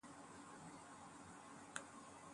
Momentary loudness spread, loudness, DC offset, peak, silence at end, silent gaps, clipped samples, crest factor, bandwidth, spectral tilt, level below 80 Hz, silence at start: 5 LU; -56 LUFS; under 0.1%; -26 dBFS; 0 s; none; under 0.1%; 30 dB; 11.5 kHz; -3 dB/octave; -82 dBFS; 0.05 s